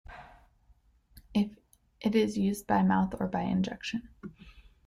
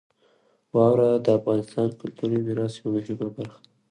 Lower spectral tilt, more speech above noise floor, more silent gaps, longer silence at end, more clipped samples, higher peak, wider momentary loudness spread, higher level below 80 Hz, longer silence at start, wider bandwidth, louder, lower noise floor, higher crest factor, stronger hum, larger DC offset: second, -6.5 dB/octave vs -8.5 dB/octave; second, 35 dB vs 40 dB; neither; second, 0.25 s vs 0.4 s; neither; second, -14 dBFS vs -6 dBFS; first, 21 LU vs 12 LU; first, -56 dBFS vs -64 dBFS; second, 0.1 s vs 0.75 s; first, 14.5 kHz vs 10 kHz; second, -30 LUFS vs -24 LUFS; about the same, -64 dBFS vs -64 dBFS; about the same, 18 dB vs 18 dB; neither; neither